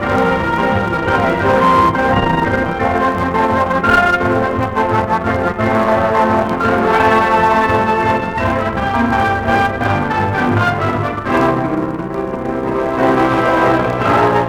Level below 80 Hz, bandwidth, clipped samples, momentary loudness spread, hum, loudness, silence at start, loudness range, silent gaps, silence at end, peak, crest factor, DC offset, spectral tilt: -34 dBFS; 19.5 kHz; under 0.1%; 5 LU; none; -14 LUFS; 0 s; 3 LU; none; 0 s; 0 dBFS; 14 dB; under 0.1%; -7 dB/octave